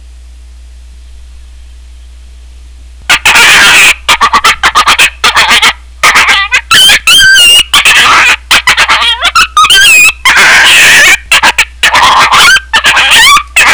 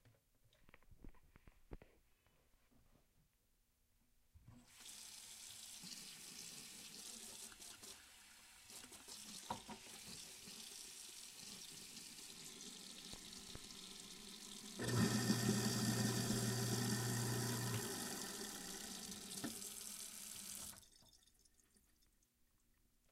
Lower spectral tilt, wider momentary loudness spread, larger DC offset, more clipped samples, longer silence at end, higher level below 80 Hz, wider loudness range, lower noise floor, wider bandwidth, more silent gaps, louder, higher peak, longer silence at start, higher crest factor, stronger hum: second, 1 dB/octave vs -3.5 dB/octave; second, 6 LU vs 19 LU; neither; first, 10% vs under 0.1%; second, 0 s vs 1.95 s; first, -30 dBFS vs -70 dBFS; second, 4 LU vs 15 LU; second, -29 dBFS vs -79 dBFS; second, 11 kHz vs 16 kHz; neither; first, -1 LUFS vs -46 LUFS; first, 0 dBFS vs -24 dBFS; first, 1.15 s vs 0.05 s; second, 4 dB vs 24 dB; neither